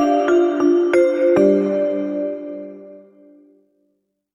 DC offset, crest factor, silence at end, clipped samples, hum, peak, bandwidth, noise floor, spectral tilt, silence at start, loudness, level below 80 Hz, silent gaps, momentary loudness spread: under 0.1%; 16 dB; 1.35 s; under 0.1%; 50 Hz at -55 dBFS; -4 dBFS; 10.5 kHz; -69 dBFS; -7 dB/octave; 0 s; -17 LUFS; -62 dBFS; none; 16 LU